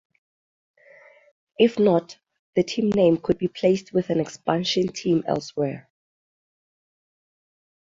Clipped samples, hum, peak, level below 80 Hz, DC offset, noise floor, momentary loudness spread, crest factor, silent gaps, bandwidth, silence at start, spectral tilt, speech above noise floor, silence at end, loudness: under 0.1%; none; -4 dBFS; -60 dBFS; under 0.1%; -52 dBFS; 9 LU; 20 dB; 2.39-2.53 s; 7.8 kHz; 1.6 s; -6 dB/octave; 30 dB; 2.15 s; -23 LUFS